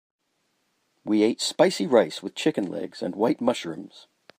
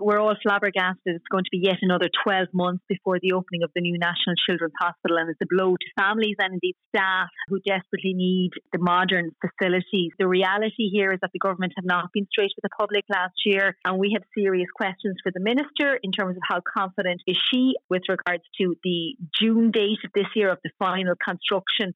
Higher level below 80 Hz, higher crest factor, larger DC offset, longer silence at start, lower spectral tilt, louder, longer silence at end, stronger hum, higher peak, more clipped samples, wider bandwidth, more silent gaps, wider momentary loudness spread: about the same, -74 dBFS vs -74 dBFS; first, 20 dB vs 12 dB; neither; first, 1.05 s vs 0 s; second, -4.5 dB/octave vs -7.5 dB/octave; about the same, -24 LUFS vs -24 LUFS; first, 0.4 s vs 0.05 s; neither; first, -4 dBFS vs -10 dBFS; neither; first, 15.5 kHz vs 5.6 kHz; second, none vs 6.86-6.92 s, 17.84-17.89 s; first, 11 LU vs 5 LU